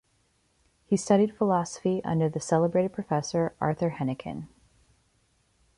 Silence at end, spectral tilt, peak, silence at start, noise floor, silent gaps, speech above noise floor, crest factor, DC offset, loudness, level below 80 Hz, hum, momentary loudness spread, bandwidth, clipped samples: 1.3 s; -6.5 dB/octave; -10 dBFS; 0.9 s; -69 dBFS; none; 43 dB; 18 dB; under 0.1%; -27 LUFS; -62 dBFS; none; 9 LU; 11 kHz; under 0.1%